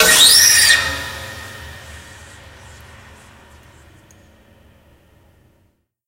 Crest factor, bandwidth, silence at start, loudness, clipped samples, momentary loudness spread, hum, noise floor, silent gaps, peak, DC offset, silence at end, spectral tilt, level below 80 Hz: 18 dB; 16 kHz; 0 s; -9 LUFS; under 0.1%; 28 LU; none; -62 dBFS; none; 0 dBFS; under 0.1%; 4.1 s; 1 dB/octave; -44 dBFS